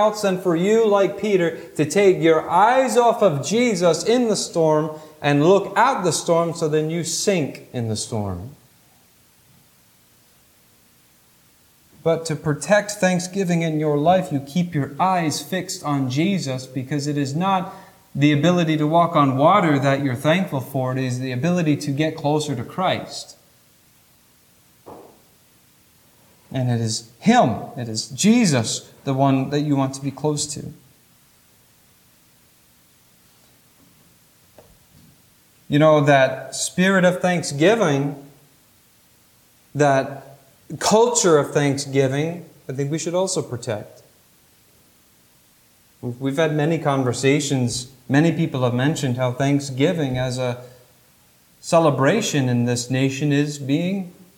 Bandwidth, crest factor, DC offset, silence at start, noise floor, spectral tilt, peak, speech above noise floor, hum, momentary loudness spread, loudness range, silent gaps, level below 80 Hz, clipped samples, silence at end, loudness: 18.5 kHz; 18 dB; under 0.1%; 0 s; -56 dBFS; -5 dB/octave; -2 dBFS; 36 dB; none; 11 LU; 10 LU; none; -60 dBFS; under 0.1%; 0.25 s; -20 LUFS